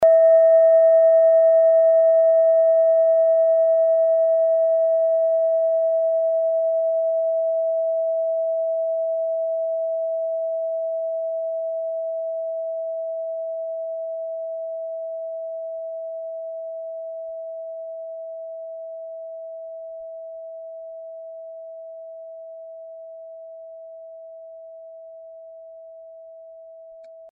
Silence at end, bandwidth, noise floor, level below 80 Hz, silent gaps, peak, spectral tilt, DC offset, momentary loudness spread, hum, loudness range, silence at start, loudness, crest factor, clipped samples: 0 s; 2 kHz; -43 dBFS; -76 dBFS; none; -8 dBFS; 3.5 dB/octave; under 0.1%; 24 LU; none; 23 LU; 0 s; -20 LUFS; 14 dB; under 0.1%